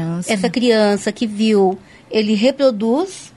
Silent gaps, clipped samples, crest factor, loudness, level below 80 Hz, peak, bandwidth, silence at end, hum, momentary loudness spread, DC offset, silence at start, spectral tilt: none; under 0.1%; 14 dB; -16 LUFS; -58 dBFS; -4 dBFS; 11.5 kHz; 0.1 s; none; 6 LU; under 0.1%; 0 s; -5.5 dB/octave